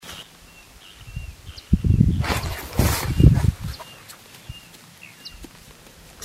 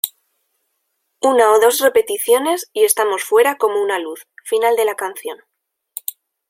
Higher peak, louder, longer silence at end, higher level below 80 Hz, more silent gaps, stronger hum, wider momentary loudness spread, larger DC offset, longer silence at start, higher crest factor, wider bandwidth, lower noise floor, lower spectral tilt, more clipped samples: about the same, 0 dBFS vs 0 dBFS; second, -21 LUFS vs -16 LUFS; second, 0 s vs 1.15 s; first, -30 dBFS vs -68 dBFS; neither; neither; first, 26 LU vs 18 LU; neither; about the same, 0.05 s vs 0.05 s; first, 24 dB vs 18 dB; about the same, 16 kHz vs 16.5 kHz; second, -47 dBFS vs -71 dBFS; first, -6 dB/octave vs -0.5 dB/octave; neither